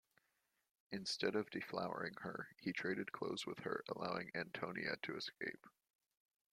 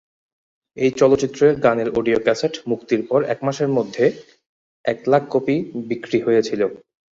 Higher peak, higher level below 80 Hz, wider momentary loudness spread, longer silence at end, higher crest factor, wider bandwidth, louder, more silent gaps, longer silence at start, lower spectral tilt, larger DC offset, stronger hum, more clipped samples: second, -24 dBFS vs -2 dBFS; second, -82 dBFS vs -56 dBFS; about the same, 8 LU vs 9 LU; first, 0.85 s vs 0.35 s; about the same, 22 dB vs 18 dB; first, 15.5 kHz vs 7.8 kHz; second, -44 LUFS vs -20 LUFS; second, none vs 4.46-4.84 s; first, 0.9 s vs 0.75 s; second, -4.5 dB/octave vs -6 dB/octave; neither; neither; neither